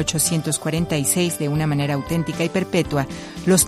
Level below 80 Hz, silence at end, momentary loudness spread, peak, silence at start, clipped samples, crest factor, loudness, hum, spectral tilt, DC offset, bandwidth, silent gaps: -44 dBFS; 0 s; 5 LU; -4 dBFS; 0 s; under 0.1%; 16 dB; -21 LUFS; none; -4.5 dB/octave; under 0.1%; 15.5 kHz; none